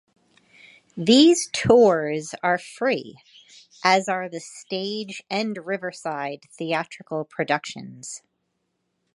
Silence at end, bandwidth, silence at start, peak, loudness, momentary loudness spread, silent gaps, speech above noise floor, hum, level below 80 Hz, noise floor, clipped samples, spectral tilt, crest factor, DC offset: 1 s; 11.5 kHz; 0.95 s; -2 dBFS; -22 LUFS; 20 LU; none; 52 dB; none; -60 dBFS; -75 dBFS; under 0.1%; -4 dB/octave; 22 dB; under 0.1%